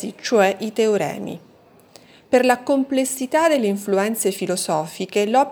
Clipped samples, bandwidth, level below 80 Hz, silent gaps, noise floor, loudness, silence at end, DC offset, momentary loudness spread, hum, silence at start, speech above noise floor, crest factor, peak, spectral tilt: under 0.1%; over 20 kHz; -68 dBFS; none; -49 dBFS; -20 LUFS; 0 s; under 0.1%; 7 LU; none; 0 s; 30 dB; 18 dB; -2 dBFS; -4 dB/octave